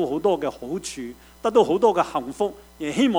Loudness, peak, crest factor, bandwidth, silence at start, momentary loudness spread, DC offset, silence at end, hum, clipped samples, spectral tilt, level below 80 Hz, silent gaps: -23 LUFS; -6 dBFS; 18 dB; over 20 kHz; 0 s; 14 LU; under 0.1%; 0 s; none; under 0.1%; -5 dB/octave; -54 dBFS; none